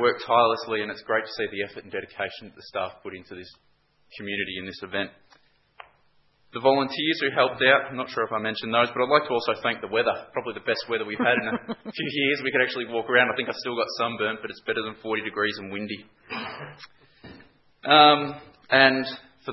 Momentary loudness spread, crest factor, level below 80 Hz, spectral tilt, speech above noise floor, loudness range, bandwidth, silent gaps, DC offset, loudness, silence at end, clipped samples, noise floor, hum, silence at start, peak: 16 LU; 26 dB; -70 dBFS; -5.5 dB/octave; 38 dB; 11 LU; 6 kHz; none; under 0.1%; -24 LUFS; 0 s; under 0.1%; -63 dBFS; none; 0 s; 0 dBFS